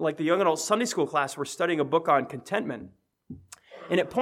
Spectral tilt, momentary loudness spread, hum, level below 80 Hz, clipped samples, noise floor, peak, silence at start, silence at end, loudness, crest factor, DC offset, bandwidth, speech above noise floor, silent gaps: -4 dB/octave; 22 LU; none; -70 dBFS; under 0.1%; -48 dBFS; -8 dBFS; 0 s; 0 s; -26 LUFS; 18 dB; under 0.1%; 16 kHz; 22 dB; none